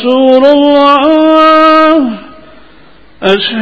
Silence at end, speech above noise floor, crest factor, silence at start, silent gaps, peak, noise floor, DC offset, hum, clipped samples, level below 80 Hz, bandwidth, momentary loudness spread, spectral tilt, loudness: 0 s; 34 dB; 8 dB; 0 s; none; 0 dBFS; -40 dBFS; under 0.1%; none; 3%; -46 dBFS; 8 kHz; 9 LU; -6 dB/octave; -6 LUFS